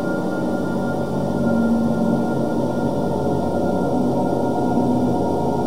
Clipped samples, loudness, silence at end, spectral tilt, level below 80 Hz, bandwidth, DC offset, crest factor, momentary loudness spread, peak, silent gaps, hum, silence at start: under 0.1%; -20 LUFS; 0 s; -8 dB/octave; -52 dBFS; 16 kHz; 3%; 12 dB; 4 LU; -6 dBFS; none; none; 0 s